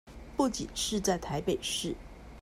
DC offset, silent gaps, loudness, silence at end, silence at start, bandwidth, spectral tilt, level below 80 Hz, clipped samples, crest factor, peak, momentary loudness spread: under 0.1%; none; -32 LUFS; 0 s; 0.05 s; 16 kHz; -3.5 dB/octave; -50 dBFS; under 0.1%; 18 dB; -14 dBFS; 10 LU